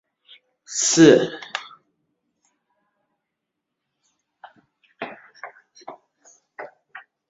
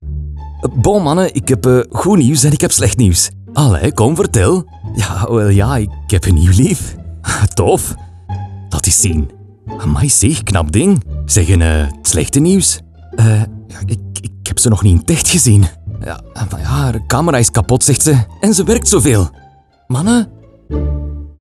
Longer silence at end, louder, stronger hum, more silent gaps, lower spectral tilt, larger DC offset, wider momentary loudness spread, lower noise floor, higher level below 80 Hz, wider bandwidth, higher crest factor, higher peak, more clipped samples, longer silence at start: first, 0.3 s vs 0.1 s; second, -17 LUFS vs -12 LUFS; neither; neither; about the same, -4.5 dB/octave vs -5 dB/octave; neither; first, 29 LU vs 14 LU; first, -81 dBFS vs -45 dBFS; second, -66 dBFS vs -26 dBFS; second, 8 kHz vs 14 kHz; first, 24 dB vs 12 dB; about the same, -2 dBFS vs 0 dBFS; neither; first, 0.7 s vs 0 s